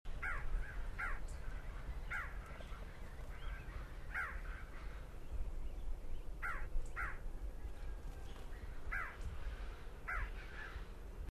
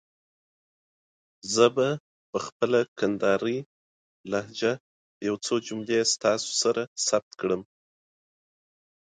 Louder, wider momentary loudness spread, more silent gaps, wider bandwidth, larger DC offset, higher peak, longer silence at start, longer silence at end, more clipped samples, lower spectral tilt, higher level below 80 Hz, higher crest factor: second, -48 LUFS vs -27 LUFS; second, 9 LU vs 12 LU; second, none vs 2.00-2.33 s, 2.52-2.60 s, 2.88-2.96 s, 3.66-4.24 s, 4.80-5.21 s, 6.87-6.96 s, 7.23-7.31 s; first, 14 kHz vs 9.6 kHz; neither; second, -28 dBFS vs -6 dBFS; second, 0.05 s vs 1.45 s; second, 0.05 s vs 1.55 s; neither; first, -5 dB/octave vs -3.5 dB/octave; first, -46 dBFS vs -70 dBFS; second, 16 dB vs 22 dB